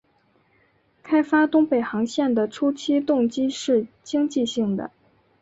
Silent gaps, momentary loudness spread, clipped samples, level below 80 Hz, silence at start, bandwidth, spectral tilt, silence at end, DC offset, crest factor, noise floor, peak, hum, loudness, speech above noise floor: none; 6 LU; under 0.1%; -64 dBFS; 1.05 s; 8 kHz; -5 dB/octave; 0.55 s; under 0.1%; 14 dB; -63 dBFS; -8 dBFS; none; -22 LUFS; 42 dB